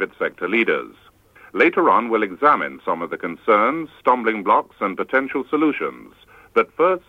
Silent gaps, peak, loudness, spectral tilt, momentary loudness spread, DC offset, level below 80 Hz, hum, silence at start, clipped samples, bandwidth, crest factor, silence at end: none; -2 dBFS; -20 LUFS; -6.5 dB/octave; 9 LU; under 0.1%; -62 dBFS; none; 0 s; under 0.1%; 7 kHz; 18 dB; 0.1 s